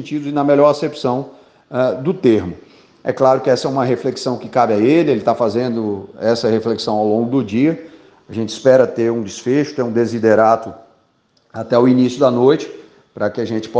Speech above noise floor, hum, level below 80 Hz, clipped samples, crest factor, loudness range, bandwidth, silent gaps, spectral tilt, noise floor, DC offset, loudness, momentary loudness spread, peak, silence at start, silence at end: 44 dB; none; -62 dBFS; under 0.1%; 16 dB; 2 LU; 9.2 kHz; none; -6.5 dB/octave; -59 dBFS; under 0.1%; -16 LUFS; 12 LU; 0 dBFS; 0 s; 0 s